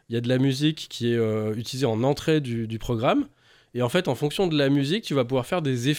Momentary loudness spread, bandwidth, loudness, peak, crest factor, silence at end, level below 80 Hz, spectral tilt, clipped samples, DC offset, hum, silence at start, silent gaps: 7 LU; 16.5 kHz; -24 LUFS; -8 dBFS; 16 dB; 0 s; -52 dBFS; -6 dB/octave; under 0.1%; under 0.1%; none; 0.1 s; none